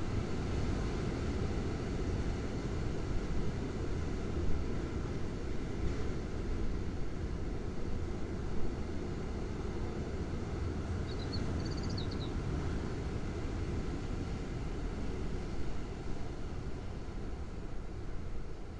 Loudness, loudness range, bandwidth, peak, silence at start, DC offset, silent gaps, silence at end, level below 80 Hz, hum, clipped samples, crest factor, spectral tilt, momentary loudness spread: -39 LUFS; 4 LU; 10 kHz; -20 dBFS; 0 s; under 0.1%; none; 0 s; -40 dBFS; none; under 0.1%; 14 dB; -7 dB/octave; 6 LU